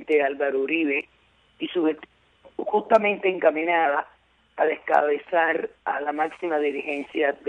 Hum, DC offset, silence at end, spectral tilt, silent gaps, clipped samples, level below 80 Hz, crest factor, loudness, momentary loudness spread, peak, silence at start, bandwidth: none; under 0.1%; 0 s; -6 dB/octave; none; under 0.1%; -68 dBFS; 18 dB; -24 LUFS; 11 LU; -6 dBFS; 0 s; 8.4 kHz